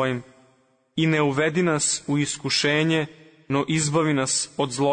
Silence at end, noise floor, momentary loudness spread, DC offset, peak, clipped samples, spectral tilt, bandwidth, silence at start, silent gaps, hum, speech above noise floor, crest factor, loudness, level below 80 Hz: 0 s; -62 dBFS; 6 LU; under 0.1%; -10 dBFS; under 0.1%; -4 dB/octave; 9.6 kHz; 0 s; none; none; 40 dB; 14 dB; -23 LUFS; -62 dBFS